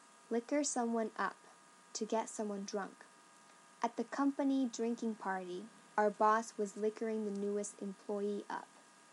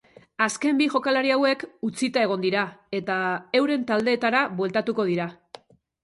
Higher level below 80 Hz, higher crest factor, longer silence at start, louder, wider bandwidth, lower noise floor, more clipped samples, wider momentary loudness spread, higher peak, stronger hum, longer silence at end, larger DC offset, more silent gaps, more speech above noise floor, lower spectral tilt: second, under -90 dBFS vs -70 dBFS; about the same, 20 dB vs 18 dB; about the same, 0.3 s vs 0.4 s; second, -38 LUFS vs -24 LUFS; about the same, 11.5 kHz vs 11.5 kHz; first, -62 dBFS vs -49 dBFS; neither; first, 12 LU vs 7 LU; second, -18 dBFS vs -6 dBFS; neither; second, 0.3 s vs 0.7 s; neither; neither; about the same, 25 dB vs 25 dB; about the same, -4 dB/octave vs -4.5 dB/octave